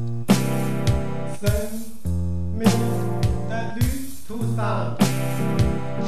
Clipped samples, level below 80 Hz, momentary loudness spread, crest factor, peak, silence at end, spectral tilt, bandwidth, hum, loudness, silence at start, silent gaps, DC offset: under 0.1%; -34 dBFS; 9 LU; 18 dB; -4 dBFS; 0 s; -6.5 dB/octave; 14 kHz; none; -24 LUFS; 0 s; none; 4%